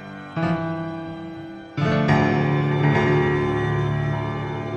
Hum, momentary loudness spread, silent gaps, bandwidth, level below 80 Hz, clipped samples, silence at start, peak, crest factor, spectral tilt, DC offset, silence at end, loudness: none; 14 LU; none; 7 kHz; -44 dBFS; under 0.1%; 0 s; -6 dBFS; 16 dB; -8 dB/octave; under 0.1%; 0 s; -22 LUFS